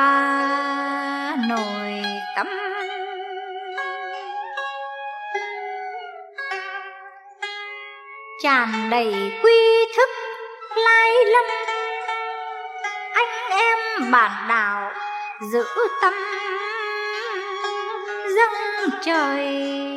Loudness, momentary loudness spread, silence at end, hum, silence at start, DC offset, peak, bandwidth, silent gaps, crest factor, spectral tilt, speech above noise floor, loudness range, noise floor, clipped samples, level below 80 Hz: -21 LUFS; 15 LU; 0 s; none; 0 s; under 0.1%; -4 dBFS; 15 kHz; none; 18 dB; -3 dB/octave; 23 dB; 12 LU; -42 dBFS; under 0.1%; -88 dBFS